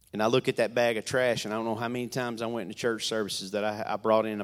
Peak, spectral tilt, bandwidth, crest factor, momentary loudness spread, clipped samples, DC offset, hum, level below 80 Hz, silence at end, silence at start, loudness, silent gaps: -10 dBFS; -4.5 dB/octave; 16 kHz; 18 dB; 6 LU; under 0.1%; under 0.1%; none; -68 dBFS; 0 s; 0.15 s; -29 LUFS; none